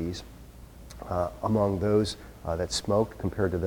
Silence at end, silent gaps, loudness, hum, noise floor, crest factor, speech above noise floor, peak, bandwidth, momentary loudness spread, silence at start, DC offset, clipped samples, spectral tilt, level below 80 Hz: 0 s; none; -28 LUFS; none; -47 dBFS; 18 dB; 20 dB; -12 dBFS; 19 kHz; 22 LU; 0 s; under 0.1%; under 0.1%; -6 dB/octave; -46 dBFS